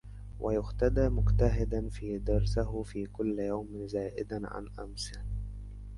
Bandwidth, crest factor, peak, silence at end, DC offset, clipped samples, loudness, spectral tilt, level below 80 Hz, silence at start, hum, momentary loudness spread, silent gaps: 11.5 kHz; 18 dB; -12 dBFS; 0 s; under 0.1%; under 0.1%; -33 LUFS; -7.5 dB/octave; -36 dBFS; 0.05 s; 50 Hz at -35 dBFS; 13 LU; none